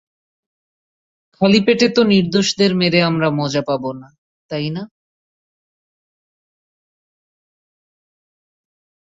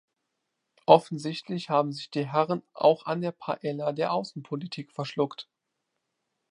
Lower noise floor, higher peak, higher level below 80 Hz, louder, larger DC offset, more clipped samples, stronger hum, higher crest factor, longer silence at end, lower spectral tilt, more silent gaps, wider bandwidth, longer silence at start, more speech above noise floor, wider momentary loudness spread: first, under -90 dBFS vs -82 dBFS; about the same, -2 dBFS vs -2 dBFS; first, -58 dBFS vs -78 dBFS; first, -16 LUFS vs -27 LUFS; neither; neither; neither; second, 18 dB vs 26 dB; first, 4.3 s vs 1.1 s; about the same, -5.5 dB/octave vs -6.5 dB/octave; first, 4.18-4.49 s vs none; second, 8 kHz vs 10.5 kHz; first, 1.4 s vs 0.9 s; first, over 74 dB vs 55 dB; about the same, 15 LU vs 14 LU